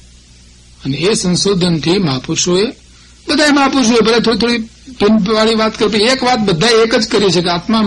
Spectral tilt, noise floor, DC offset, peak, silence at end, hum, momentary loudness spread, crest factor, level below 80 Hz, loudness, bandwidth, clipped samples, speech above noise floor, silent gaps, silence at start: -4 dB/octave; -41 dBFS; under 0.1%; -2 dBFS; 0 s; 60 Hz at -40 dBFS; 7 LU; 12 dB; -40 dBFS; -12 LUFS; 11.5 kHz; under 0.1%; 29 dB; none; 0.85 s